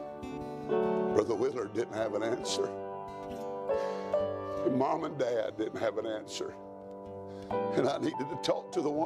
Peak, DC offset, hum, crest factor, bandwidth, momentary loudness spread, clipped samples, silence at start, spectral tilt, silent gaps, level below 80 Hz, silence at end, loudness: -12 dBFS; under 0.1%; none; 22 dB; 13.5 kHz; 12 LU; under 0.1%; 0 s; -5 dB/octave; none; -64 dBFS; 0 s; -33 LUFS